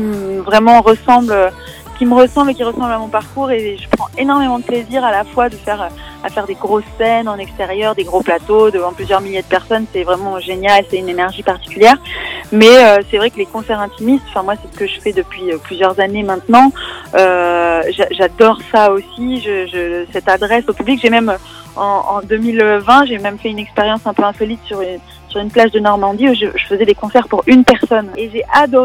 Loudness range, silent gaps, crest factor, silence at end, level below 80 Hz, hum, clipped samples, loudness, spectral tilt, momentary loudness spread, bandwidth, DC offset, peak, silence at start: 6 LU; none; 12 dB; 0 s; -40 dBFS; none; 1%; -13 LUFS; -5 dB/octave; 12 LU; 17.5 kHz; under 0.1%; 0 dBFS; 0 s